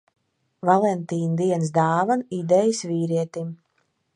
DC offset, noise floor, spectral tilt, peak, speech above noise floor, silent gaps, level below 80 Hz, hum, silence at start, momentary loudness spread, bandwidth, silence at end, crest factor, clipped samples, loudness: under 0.1%; -70 dBFS; -6.5 dB/octave; -4 dBFS; 49 dB; none; -72 dBFS; none; 0.65 s; 8 LU; 10.5 kHz; 0.6 s; 20 dB; under 0.1%; -22 LUFS